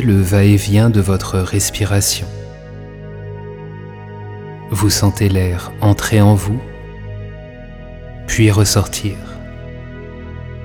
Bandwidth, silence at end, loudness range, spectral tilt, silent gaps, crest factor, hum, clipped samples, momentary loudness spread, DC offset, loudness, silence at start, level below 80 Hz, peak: 18 kHz; 0 s; 5 LU; -5 dB/octave; none; 14 dB; none; under 0.1%; 20 LU; under 0.1%; -14 LUFS; 0 s; -34 dBFS; -2 dBFS